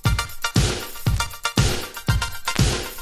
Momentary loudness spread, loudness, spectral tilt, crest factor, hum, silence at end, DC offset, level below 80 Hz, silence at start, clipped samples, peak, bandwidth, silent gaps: 4 LU; -23 LUFS; -4 dB/octave; 20 dB; none; 0 s; under 0.1%; -30 dBFS; 0.05 s; under 0.1%; -2 dBFS; 16 kHz; none